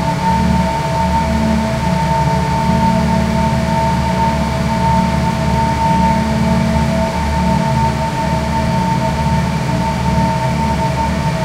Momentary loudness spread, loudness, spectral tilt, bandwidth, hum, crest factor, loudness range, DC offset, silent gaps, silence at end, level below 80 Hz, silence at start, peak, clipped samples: 3 LU; -15 LUFS; -6.5 dB/octave; 16 kHz; none; 14 dB; 1 LU; under 0.1%; none; 0 s; -24 dBFS; 0 s; 0 dBFS; under 0.1%